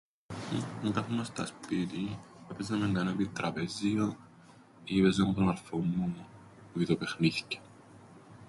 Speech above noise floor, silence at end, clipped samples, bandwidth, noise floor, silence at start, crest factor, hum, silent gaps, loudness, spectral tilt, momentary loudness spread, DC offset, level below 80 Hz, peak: 25 dB; 0 s; under 0.1%; 11.5 kHz; -57 dBFS; 0.3 s; 20 dB; none; none; -32 LUFS; -6 dB/octave; 15 LU; under 0.1%; -58 dBFS; -14 dBFS